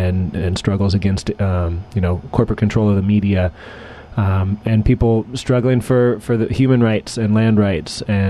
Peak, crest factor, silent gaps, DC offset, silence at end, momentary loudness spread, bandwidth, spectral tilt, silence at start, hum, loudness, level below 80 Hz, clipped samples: 0 dBFS; 16 dB; none; under 0.1%; 0 s; 6 LU; 12 kHz; -7.5 dB/octave; 0 s; none; -17 LUFS; -32 dBFS; under 0.1%